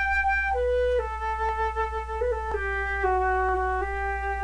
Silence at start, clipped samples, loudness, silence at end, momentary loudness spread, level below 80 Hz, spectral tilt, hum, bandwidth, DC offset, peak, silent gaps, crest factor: 0 s; under 0.1%; -26 LUFS; 0 s; 5 LU; -36 dBFS; -6.5 dB/octave; none; 10.5 kHz; under 0.1%; -14 dBFS; none; 12 dB